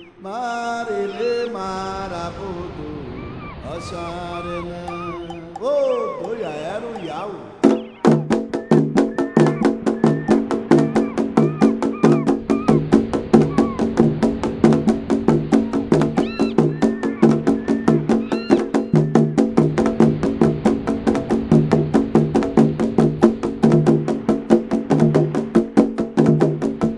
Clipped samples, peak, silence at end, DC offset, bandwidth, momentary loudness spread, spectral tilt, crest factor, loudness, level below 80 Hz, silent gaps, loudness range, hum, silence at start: under 0.1%; 0 dBFS; 0 s; under 0.1%; 10.5 kHz; 13 LU; -8 dB/octave; 18 dB; -18 LUFS; -44 dBFS; none; 9 LU; none; 0 s